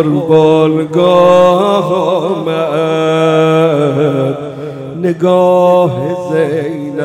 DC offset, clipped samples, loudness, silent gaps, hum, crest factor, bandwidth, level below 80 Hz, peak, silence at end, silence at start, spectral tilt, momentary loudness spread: under 0.1%; under 0.1%; -11 LUFS; none; none; 10 dB; 12.5 kHz; -54 dBFS; 0 dBFS; 0 s; 0 s; -7 dB/octave; 10 LU